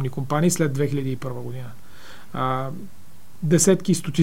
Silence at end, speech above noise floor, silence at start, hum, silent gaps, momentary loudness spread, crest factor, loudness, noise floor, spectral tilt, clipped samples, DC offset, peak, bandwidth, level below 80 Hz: 0 s; 24 dB; 0 s; none; none; 18 LU; 18 dB; -22 LUFS; -46 dBFS; -5.5 dB/octave; under 0.1%; 3%; -4 dBFS; 16.5 kHz; -58 dBFS